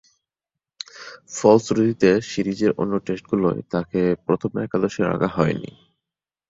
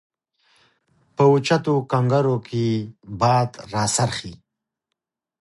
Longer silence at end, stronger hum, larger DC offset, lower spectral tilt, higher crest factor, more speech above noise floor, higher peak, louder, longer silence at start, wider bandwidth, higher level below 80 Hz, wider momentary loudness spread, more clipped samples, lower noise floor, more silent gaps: second, 0.8 s vs 1.05 s; neither; neither; about the same, -6.5 dB/octave vs -5.5 dB/octave; about the same, 20 dB vs 18 dB; first, 67 dB vs 63 dB; about the same, -2 dBFS vs -4 dBFS; about the same, -21 LUFS vs -21 LUFS; second, 0.95 s vs 1.2 s; second, 7.8 kHz vs 11.5 kHz; about the same, -54 dBFS vs -56 dBFS; first, 18 LU vs 12 LU; neither; first, -88 dBFS vs -83 dBFS; neither